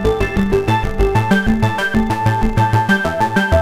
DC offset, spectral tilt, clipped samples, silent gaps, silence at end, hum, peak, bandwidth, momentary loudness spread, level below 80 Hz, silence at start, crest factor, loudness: under 0.1%; -6.5 dB/octave; under 0.1%; none; 0 s; none; -2 dBFS; 15.5 kHz; 2 LU; -24 dBFS; 0 s; 14 dB; -16 LUFS